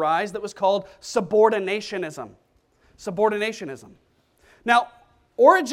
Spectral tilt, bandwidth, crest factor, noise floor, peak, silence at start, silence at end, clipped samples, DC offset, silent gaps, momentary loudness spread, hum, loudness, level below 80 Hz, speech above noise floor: -4 dB/octave; 14.5 kHz; 22 dB; -61 dBFS; -2 dBFS; 0 s; 0 s; under 0.1%; under 0.1%; none; 19 LU; none; -22 LUFS; -64 dBFS; 40 dB